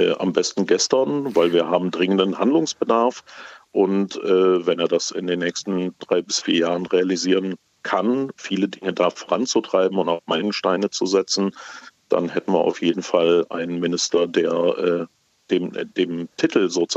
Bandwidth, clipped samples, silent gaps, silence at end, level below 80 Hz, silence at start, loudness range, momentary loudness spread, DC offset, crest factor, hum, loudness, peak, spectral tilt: 8.2 kHz; under 0.1%; none; 0 s; -72 dBFS; 0 s; 2 LU; 7 LU; under 0.1%; 18 dB; none; -21 LUFS; -4 dBFS; -4 dB/octave